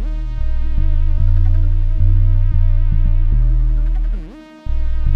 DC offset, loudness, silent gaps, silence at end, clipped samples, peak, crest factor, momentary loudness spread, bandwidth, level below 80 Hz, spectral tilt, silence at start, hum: under 0.1%; -19 LUFS; none; 0 s; under 0.1%; -2 dBFS; 10 dB; 9 LU; 2.6 kHz; -14 dBFS; -9.5 dB/octave; 0 s; none